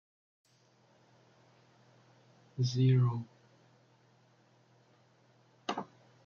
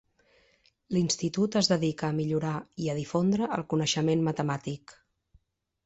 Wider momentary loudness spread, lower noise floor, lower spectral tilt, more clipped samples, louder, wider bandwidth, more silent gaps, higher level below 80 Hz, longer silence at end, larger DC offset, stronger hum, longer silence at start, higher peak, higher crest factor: first, 23 LU vs 8 LU; about the same, -68 dBFS vs -66 dBFS; first, -7 dB/octave vs -5 dB/octave; neither; second, -32 LUFS vs -28 LUFS; second, 7 kHz vs 8.2 kHz; neither; second, -76 dBFS vs -62 dBFS; second, 0.4 s vs 0.95 s; neither; neither; first, 2.55 s vs 0.9 s; second, -18 dBFS vs -12 dBFS; about the same, 20 dB vs 18 dB